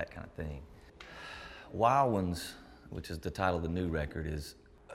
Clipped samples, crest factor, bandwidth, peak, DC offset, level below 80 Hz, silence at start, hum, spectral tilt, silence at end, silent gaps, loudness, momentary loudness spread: under 0.1%; 22 dB; 16 kHz; -14 dBFS; under 0.1%; -52 dBFS; 0 s; none; -6 dB/octave; 0 s; none; -34 LUFS; 20 LU